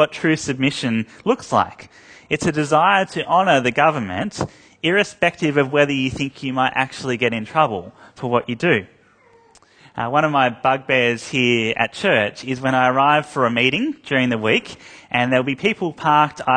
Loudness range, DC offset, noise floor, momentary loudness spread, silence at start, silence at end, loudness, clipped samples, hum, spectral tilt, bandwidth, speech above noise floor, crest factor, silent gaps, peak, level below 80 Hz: 4 LU; under 0.1%; -53 dBFS; 8 LU; 0 s; 0 s; -19 LUFS; under 0.1%; none; -5 dB/octave; 9.8 kHz; 34 dB; 18 dB; none; 0 dBFS; -54 dBFS